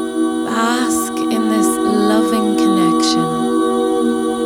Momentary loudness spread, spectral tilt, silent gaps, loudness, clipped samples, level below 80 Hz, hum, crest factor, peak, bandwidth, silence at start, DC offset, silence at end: 4 LU; -4 dB/octave; none; -15 LUFS; under 0.1%; -50 dBFS; none; 12 dB; -4 dBFS; 17.5 kHz; 0 s; under 0.1%; 0 s